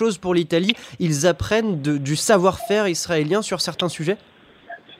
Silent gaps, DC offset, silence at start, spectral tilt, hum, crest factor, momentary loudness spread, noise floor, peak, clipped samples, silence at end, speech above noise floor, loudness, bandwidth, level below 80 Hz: none; under 0.1%; 0 s; -4.5 dB/octave; none; 20 dB; 8 LU; -41 dBFS; 0 dBFS; under 0.1%; 0.05 s; 21 dB; -20 LUFS; 16 kHz; -50 dBFS